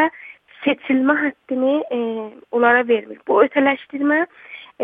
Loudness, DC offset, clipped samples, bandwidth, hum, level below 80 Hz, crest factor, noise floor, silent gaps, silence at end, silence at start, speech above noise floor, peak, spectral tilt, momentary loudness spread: -19 LUFS; under 0.1%; under 0.1%; 3.9 kHz; none; -70 dBFS; 18 dB; -42 dBFS; none; 0 s; 0 s; 23 dB; -2 dBFS; -7.5 dB/octave; 11 LU